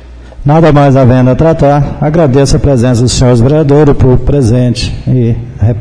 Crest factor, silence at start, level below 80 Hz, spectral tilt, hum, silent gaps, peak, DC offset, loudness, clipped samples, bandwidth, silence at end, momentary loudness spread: 6 dB; 0 s; -20 dBFS; -7 dB/octave; none; none; 0 dBFS; 3%; -7 LUFS; 0.2%; 10.5 kHz; 0 s; 7 LU